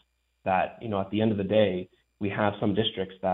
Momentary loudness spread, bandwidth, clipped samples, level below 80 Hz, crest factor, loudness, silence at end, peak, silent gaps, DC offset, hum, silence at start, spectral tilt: 11 LU; 4.1 kHz; under 0.1%; -62 dBFS; 20 dB; -28 LUFS; 0 s; -8 dBFS; none; under 0.1%; none; 0.45 s; -9.5 dB/octave